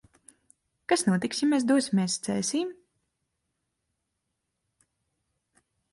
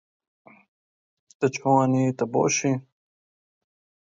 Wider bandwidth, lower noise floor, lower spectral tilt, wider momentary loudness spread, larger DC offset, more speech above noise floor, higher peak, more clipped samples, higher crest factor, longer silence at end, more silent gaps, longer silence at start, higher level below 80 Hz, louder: first, 11.5 kHz vs 7.8 kHz; second, -81 dBFS vs under -90 dBFS; about the same, -4.5 dB/octave vs -5 dB/octave; about the same, 7 LU vs 7 LU; neither; second, 56 dB vs over 68 dB; second, -10 dBFS vs -6 dBFS; neither; about the same, 20 dB vs 20 dB; first, 3.2 s vs 1.3 s; neither; second, 0.9 s vs 1.4 s; about the same, -72 dBFS vs -70 dBFS; second, -26 LUFS vs -23 LUFS